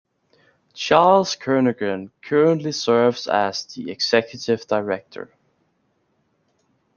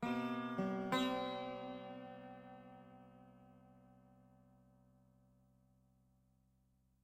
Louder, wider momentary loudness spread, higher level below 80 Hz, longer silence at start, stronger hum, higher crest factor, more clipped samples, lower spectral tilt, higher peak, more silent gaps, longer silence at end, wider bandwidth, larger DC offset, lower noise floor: first, -20 LUFS vs -42 LUFS; second, 14 LU vs 25 LU; first, -66 dBFS vs -78 dBFS; first, 0.75 s vs 0 s; neither; about the same, 20 dB vs 24 dB; neither; about the same, -4.5 dB/octave vs -5.5 dB/octave; first, -2 dBFS vs -22 dBFS; neither; second, 1.75 s vs 2.75 s; second, 7.2 kHz vs 15.5 kHz; neither; second, -67 dBFS vs -76 dBFS